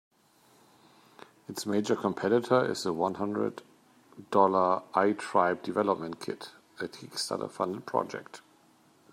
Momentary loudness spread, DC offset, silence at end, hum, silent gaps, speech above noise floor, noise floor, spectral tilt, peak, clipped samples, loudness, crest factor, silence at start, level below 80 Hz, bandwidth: 16 LU; under 0.1%; 0.75 s; none; none; 34 dB; -63 dBFS; -5 dB/octave; -8 dBFS; under 0.1%; -29 LUFS; 22 dB; 1.5 s; -78 dBFS; 16 kHz